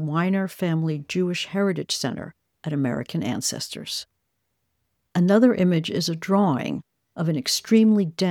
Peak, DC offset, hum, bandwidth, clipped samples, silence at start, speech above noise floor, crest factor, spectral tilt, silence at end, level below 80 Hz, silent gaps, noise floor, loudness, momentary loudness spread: -6 dBFS; under 0.1%; none; 17 kHz; under 0.1%; 0 s; 54 dB; 18 dB; -5.5 dB/octave; 0 s; -66 dBFS; none; -76 dBFS; -23 LUFS; 13 LU